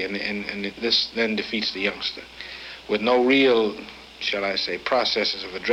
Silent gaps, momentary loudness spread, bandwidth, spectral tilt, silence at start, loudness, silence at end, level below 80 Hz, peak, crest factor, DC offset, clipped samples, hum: none; 17 LU; 12 kHz; -4 dB/octave; 0 s; -23 LUFS; 0 s; -56 dBFS; -6 dBFS; 18 dB; under 0.1%; under 0.1%; none